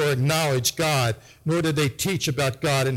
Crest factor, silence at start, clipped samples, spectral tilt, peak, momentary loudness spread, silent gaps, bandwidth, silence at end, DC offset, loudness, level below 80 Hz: 16 dB; 0 s; under 0.1%; -4.5 dB/octave; -8 dBFS; 4 LU; none; 17 kHz; 0 s; under 0.1%; -23 LUFS; -52 dBFS